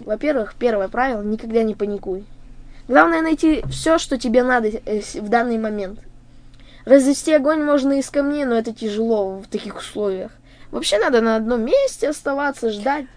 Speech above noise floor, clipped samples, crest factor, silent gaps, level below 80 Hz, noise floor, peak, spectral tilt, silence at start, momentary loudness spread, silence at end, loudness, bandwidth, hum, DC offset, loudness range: 24 dB; under 0.1%; 20 dB; none; -42 dBFS; -42 dBFS; 0 dBFS; -4.5 dB/octave; 0 s; 13 LU; 0.1 s; -19 LUFS; 11 kHz; none; under 0.1%; 3 LU